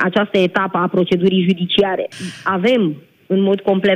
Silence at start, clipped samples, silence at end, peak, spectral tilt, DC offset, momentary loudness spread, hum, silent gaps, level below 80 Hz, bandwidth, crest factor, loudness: 0 s; under 0.1%; 0 s; -4 dBFS; -6.5 dB/octave; under 0.1%; 7 LU; none; none; -58 dBFS; 10 kHz; 12 dB; -17 LUFS